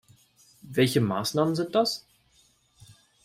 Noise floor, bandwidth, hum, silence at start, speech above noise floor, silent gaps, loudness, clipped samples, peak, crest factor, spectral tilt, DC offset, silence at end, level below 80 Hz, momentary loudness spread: -64 dBFS; 16 kHz; none; 0.65 s; 39 dB; none; -26 LUFS; under 0.1%; -10 dBFS; 18 dB; -5.5 dB/octave; under 0.1%; 0.3 s; -66 dBFS; 7 LU